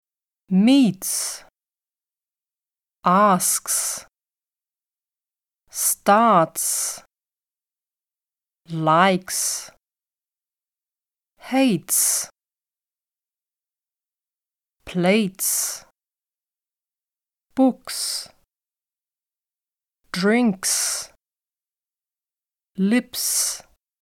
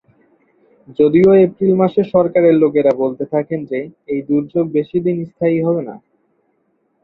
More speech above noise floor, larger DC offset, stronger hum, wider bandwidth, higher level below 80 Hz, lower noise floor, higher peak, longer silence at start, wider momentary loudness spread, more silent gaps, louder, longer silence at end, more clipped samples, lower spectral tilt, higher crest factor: first, over 70 dB vs 49 dB; neither; neither; first, 18 kHz vs 4.6 kHz; second, -68 dBFS vs -56 dBFS; first, under -90 dBFS vs -64 dBFS; about the same, -2 dBFS vs 0 dBFS; second, 0.5 s vs 0.9 s; first, 15 LU vs 12 LU; neither; second, -20 LUFS vs -15 LUFS; second, 0.4 s vs 1.05 s; neither; second, -3.5 dB/octave vs -10.5 dB/octave; first, 22 dB vs 14 dB